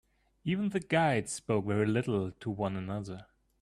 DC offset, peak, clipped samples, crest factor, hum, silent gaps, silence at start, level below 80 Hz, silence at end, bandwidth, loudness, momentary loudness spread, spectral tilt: under 0.1%; -14 dBFS; under 0.1%; 18 dB; none; none; 0.45 s; -64 dBFS; 0.4 s; 12.5 kHz; -32 LUFS; 11 LU; -6 dB/octave